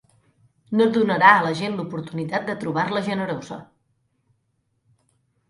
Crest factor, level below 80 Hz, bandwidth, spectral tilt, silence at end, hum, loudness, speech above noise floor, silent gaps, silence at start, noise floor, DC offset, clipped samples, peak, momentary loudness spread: 24 dB; -66 dBFS; 11.5 kHz; -6 dB/octave; 1.85 s; none; -21 LUFS; 50 dB; none; 0.7 s; -71 dBFS; under 0.1%; under 0.1%; 0 dBFS; 15 LU